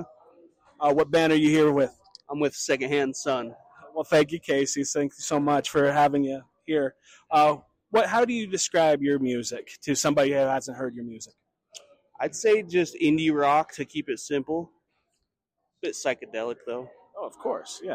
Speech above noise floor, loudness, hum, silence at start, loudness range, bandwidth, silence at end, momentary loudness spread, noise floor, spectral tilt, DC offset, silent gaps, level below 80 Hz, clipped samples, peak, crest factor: 57 dB; -25 LUFS; none; 0 s; 5 LU; 15.5 kHz; 0 s; 14 LU; -82 dBFS; -4 dB/octave; under 0.1%; none; -66 dBFS; under 0.1%; -12 dBFS; 14 dB